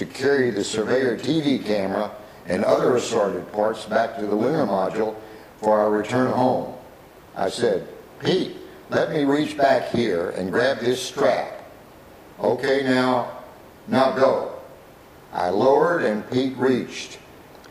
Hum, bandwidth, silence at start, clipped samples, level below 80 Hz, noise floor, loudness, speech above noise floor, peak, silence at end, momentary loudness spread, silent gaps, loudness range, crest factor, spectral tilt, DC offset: none; 15.5 kHz; 0 s; under 0.1%; -58 dBFS; -46 dBFS; -22 LUFS; 25 dB; -4 dBFS; 0 s; 14 LU; none; 2 LU; 18 dB; -5.5 dB/octave; under 0.1%